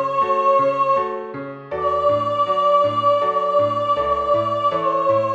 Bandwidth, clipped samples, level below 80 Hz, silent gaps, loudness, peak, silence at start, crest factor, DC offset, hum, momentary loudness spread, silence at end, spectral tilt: 8 kHz; under 0.1%; -52 dBFS; none; -18 LUFS; -6 dBFS; 0 s; 12 dB; under 0.1%; none; 8 LU; 0 s; -6.5 dB/octave